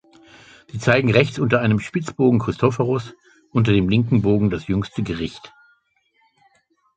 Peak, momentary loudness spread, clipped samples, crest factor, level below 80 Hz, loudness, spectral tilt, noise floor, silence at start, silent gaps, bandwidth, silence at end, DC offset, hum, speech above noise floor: -2 dBFS; 10 LU; under 0.1%; 20 dB; -44 dBFS; -20 LUFS; -7.5 dB/octave; -64 dBFS; 0.75 s; none; 8.8 kHz; 1.5 s; under 0.1%; none; 46 dB